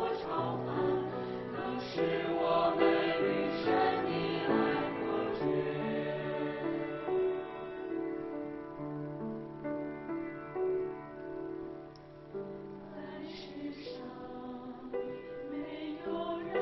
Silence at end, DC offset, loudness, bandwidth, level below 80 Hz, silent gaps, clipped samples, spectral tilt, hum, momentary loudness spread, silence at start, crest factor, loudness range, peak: 0 s; under 0.1%; -35 LUFS; 6 kHz; -64 dBFS; none; under 0.1%; -8 dB/octave; none; 14 LU; 0 s; 20 dB; 12 LU; -16 dBFS